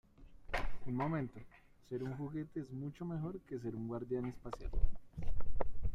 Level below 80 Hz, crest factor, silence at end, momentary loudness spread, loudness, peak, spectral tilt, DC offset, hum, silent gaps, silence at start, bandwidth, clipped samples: -44 dBFS; 18 dB; 0 s; 8 LU; -43 LUFS; -16 dBFS; -8 dB/octave; under 0.1%; none; none; 0.2 s; 6 kHz; under 0.1%